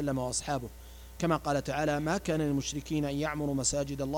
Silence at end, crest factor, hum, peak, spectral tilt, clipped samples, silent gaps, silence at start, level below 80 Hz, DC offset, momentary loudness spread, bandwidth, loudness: 0 s; 16 dB; none; -16 dBFS; -4.5 dB/octave; under 0.1%; none; 0 s; -48 dBFS; under 0.1%; 6 LU; 18.5 kHz; -31 LUFS